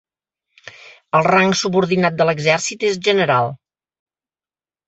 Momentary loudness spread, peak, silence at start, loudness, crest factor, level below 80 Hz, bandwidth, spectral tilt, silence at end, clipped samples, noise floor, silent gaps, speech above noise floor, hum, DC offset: 5 LU; -2 dBFS; 0.65 s; -16 LUFS; 18 dB; -60 dBFS; 8.2 kHz; -4.5 dB/octave; 1.35 s; under 0.1%; under -90 dBFS; none; over 74 dB; none; under 0.1%